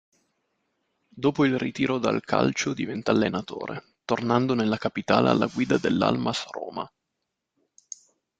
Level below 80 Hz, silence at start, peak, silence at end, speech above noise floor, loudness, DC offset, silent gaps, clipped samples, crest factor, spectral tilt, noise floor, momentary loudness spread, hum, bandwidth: -62 dBFS; 1.15 s; -4 dBFS; 1.5 s; 57 dB; -25 LUFS; under 0.1%; none; under 0.1%; 22 dB; -5.5 dB/octave; -82 dBFS; 14 LU; none; 9 kHz